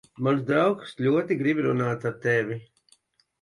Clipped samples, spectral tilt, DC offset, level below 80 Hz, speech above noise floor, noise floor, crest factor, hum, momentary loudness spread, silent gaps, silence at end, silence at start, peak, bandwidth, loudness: under 0.1%; -7.5 dB/octave; under 0.1%; -68 dBFS; 40 dB; -64 dBFS; 16 dB; none; 5 LU; none; 0.8 s; 0.2 s; -10 dBFS; 11.5 kHz; -25 LUFS